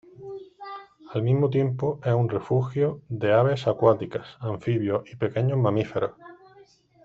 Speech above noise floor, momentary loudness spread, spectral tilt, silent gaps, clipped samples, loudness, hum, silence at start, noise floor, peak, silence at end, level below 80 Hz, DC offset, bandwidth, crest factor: 31 dB; 19 LU; -9 dB/octave; none; under 0.1%; -25 LUFS; none; 0.2 s; -55 dBFS; -4 dBFS; 0.7 s; -60 dBFS; under 0.1%; 7.2 kHz; 20 dB